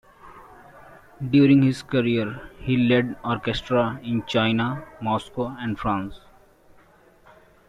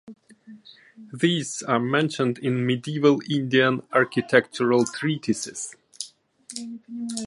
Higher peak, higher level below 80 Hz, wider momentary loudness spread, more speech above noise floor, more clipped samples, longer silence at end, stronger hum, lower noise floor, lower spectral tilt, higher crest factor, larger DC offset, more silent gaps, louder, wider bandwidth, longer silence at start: second, -6 dBFS vs -2 dBFS; first, -50 dBFS vs -68 dBFS; second, 12 LU vs 16 LU; first, 32 dB vs 24 dB; neither; first, 1.5 s vs 0 s; neither; first, -54 dBFS vs -47 dBFS; first, -7.5 dB/octave vs -5 dB/octave; about the same, 18 dB vs 22 dB; neither; neither; about the same, -23 LUFS vs -23 LUFS; about the same, 10.5 kHz vs 11.5 kHz; first, 0.25 s vs 0.05 s